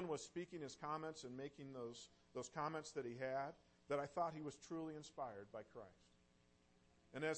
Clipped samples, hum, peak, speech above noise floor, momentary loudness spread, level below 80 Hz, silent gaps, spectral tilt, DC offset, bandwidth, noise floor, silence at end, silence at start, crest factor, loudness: under 0.1%; none; -32 dBFS; 26 dB; 11 LU; -80 dBFS; none; -5 dB/octave; under 0.1%; 8.4 kHz; -75 dBFS; 0 s; 0 s; 18 dB; -49 LUFS